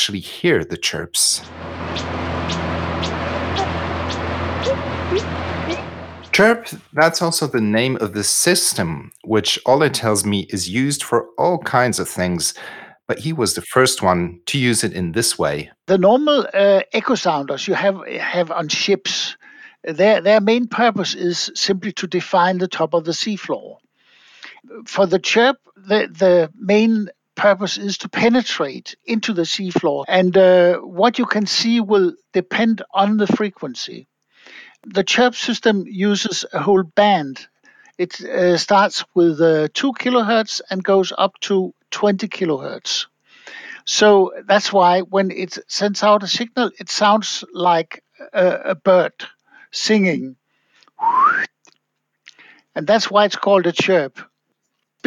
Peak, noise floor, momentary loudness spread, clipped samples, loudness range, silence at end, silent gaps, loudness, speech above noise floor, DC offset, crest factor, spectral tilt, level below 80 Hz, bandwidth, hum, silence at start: -2 dBFS; -72 dBFS; 11 LU; under 0.1%; 4 LU; 0.85 s; none; -18 LUFS; 55 dB; under 0.1%; 16 dB; -4 dB/octave; -48 dBFS; 17 kHz; none; 0 s